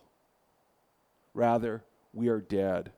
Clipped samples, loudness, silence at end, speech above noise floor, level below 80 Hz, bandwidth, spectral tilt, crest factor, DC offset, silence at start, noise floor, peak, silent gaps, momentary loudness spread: under 0.1%; -30 LUFS; 0.1 s; 42 dB; -64 dBFS; 13.5 kHz; -8.5 dB/octave; 18 dB; under 0.1%; 1.35 s; -71 dBFS; -14 dBFS; none; 16 LU